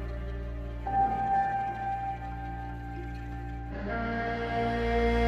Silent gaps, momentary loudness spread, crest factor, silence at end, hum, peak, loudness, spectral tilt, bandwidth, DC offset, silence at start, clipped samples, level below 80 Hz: none; 11 LU; 14 dB; 0 s; none; -16 dBFS; -32 LUFS; -7.5 dB/octave; 7.8 kHz; under 0.1%; 0 s; under 0.1%; -38 dBFS